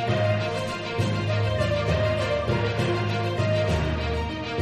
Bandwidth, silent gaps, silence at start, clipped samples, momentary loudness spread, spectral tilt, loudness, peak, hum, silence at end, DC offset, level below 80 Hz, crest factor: 11.5 kHz; none; 0 s; under 0.1%; 4 LU; -6.5 dB/octave; -25 LUFS; -12 dBFS; none; 0 s; under 0.1%; -38 dBFS; 12 dB